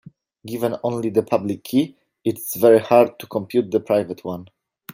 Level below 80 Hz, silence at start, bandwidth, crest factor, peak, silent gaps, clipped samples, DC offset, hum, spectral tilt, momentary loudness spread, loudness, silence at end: -66 dBFS; 0.45 s; 16.5 kHz; 18 dB; -2 dBFS; none; under 0.1%; under 0.1%; none; -6 dB/octave; 14 LU; -20 LUFS; 0.5 s